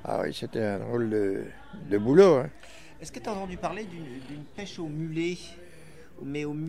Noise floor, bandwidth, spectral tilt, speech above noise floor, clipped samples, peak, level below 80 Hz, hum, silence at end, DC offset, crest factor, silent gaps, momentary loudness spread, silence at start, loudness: -51 dBFS; 12.5 kHz; -6.5 dB/octave; 23 dB; under 0.1%; -6 dBFS; -56 dBFS; none; 0 s; 0.4%; 22 dB; none; 22 LU; 0 s; -27 LUFS